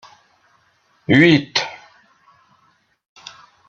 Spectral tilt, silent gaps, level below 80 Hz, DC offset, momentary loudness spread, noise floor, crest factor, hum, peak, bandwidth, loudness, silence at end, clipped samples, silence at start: -5.5 dB/octave; none; -58 dBFS; under 0.1%; 28 LU; -61 dBFS; 20 dB; none; -2 dBFS; 7.8 kHz; -15 LUFS; 1.95 s; under 0.1%; 1.1 s